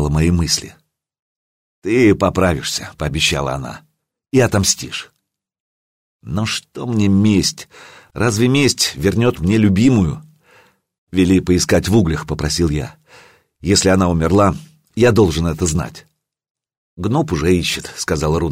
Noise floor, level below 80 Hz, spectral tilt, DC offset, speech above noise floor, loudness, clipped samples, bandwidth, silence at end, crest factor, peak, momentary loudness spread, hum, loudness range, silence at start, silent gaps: -52 dBFS; -34 dBFS; -5 dB/octave; under 0.1%; 37 dB; -16 LUFS; under 0.1%; 16 kHz; 0 s; 16 dB; -2 dBFS; 13 LU; none; 4 LU; 0 s; 1.19-1.82 s, 5.60-6.19 s, 10.98-11.07 s, 16.50-16.55 s, 16.77-16.97 s